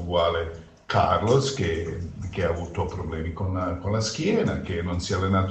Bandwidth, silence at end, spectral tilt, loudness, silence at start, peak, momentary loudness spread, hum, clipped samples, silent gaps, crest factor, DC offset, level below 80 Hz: 8.6 kHz; 0 s; -5.5 dB/octave; -26 LUFS; 0 s; -8 dBFS; 10 LU; none; under 0.1%; none; 18 dB; under 0.1%; -42 dBFS